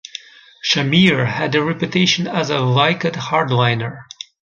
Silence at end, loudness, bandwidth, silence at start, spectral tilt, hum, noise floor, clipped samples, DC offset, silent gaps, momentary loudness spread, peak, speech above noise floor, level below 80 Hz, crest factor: 0.55 s; -16 LUFS; 7.4 kHz; 0.65 s; -5 dB/octave; none; -38 dBFS; under 0.1%; under 0.1%; none; 20 LU; -2 dBFS; 21 dB; -54 dBFS; 16 dB